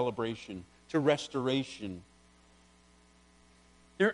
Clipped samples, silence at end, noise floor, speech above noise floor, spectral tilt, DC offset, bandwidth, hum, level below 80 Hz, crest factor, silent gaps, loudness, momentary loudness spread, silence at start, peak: under 0.1%; 0 s; -62 dBFS; 29 dB; -5.5 dB/octave; under 0.1%; 10.5 kHz; none; -66 dBFS; 22 dB; none; -33 LUFS; 17 LU; 0 s; -12 dBFS